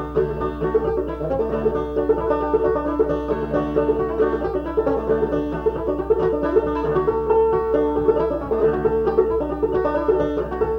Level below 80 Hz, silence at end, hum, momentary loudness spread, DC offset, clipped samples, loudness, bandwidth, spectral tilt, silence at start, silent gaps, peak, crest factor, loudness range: -36 dBFS; 0 s; none; 4 LU; under 0.1%; under 0.1%; -21 LUFS; 5.4 kHz; -9.5 dB/octave; 0 s; none; -6 dBFS; 16 dB; 2 LU